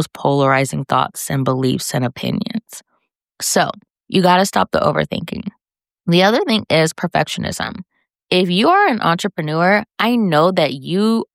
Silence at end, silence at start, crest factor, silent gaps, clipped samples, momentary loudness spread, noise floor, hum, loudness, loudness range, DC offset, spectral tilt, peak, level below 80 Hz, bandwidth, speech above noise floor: 0.1 s; 0 s; 16 dB; none; under 0.1%; 12 LU; -68 dBFS; none; -16 LUFS; 4 LU; under 0.1%; -4.5 dB/octave; -2 dBFS; -52 dBFS; 16 kHz; 52 dB